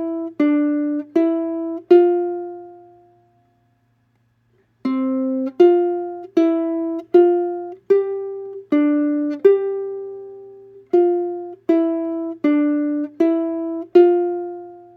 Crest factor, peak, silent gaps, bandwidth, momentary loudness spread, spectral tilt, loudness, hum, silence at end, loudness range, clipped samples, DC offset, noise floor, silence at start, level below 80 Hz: 18 dB; 0 dBFS; none; 4.6 kHz; 15 LU; -7.5 dB/octave; -19 LUFS; none; 0.15 s; 4 LU; under 0.1%; under 0.1%; -63 dBFS; 0 s; -76 dBFS